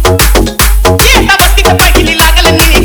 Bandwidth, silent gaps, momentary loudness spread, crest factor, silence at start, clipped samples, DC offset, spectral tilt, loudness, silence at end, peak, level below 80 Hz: over 20 kHz; none; 3 LU; 6 dB; 0 s; 6%; under 0.1%; -3.5 dB/octave; -5 LUFS; 0 s; 0 dBFS; -10 dBFS